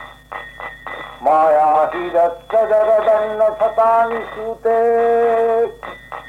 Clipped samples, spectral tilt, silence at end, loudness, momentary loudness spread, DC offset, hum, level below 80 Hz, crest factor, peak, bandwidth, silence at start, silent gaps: under 0.1%; -5.5 dB/octave; 0 s; -16 LUFS; 17 LU; under 0.1%; none; -50 dBFS; 10 dB; -6 dBFS; 9.8 kHz; 0 s; none